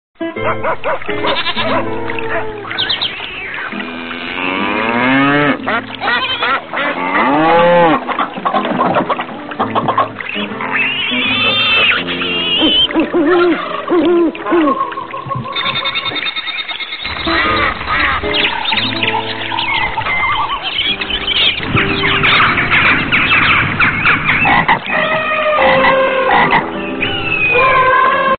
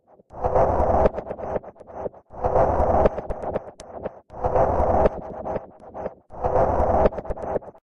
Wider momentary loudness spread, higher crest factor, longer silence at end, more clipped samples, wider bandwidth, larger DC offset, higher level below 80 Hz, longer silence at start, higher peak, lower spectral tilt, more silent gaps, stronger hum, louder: second, 10 LU vs 15 LU; about the same, 14 dB vs 16 dB; second, 0 s vs 0.15 s; neither; second, 4.7 kHz vs 10.5 kHz; neither; about the same, -38 dBFS vs -34 dBFS; second, 0.2 s vs 0.35 s; first, 0 dBFS vs -6 dBFS; second, -1.5 dB/octave vs -9 dB/octave; neither; neither; first, -13 LUFS vs -23 LUFS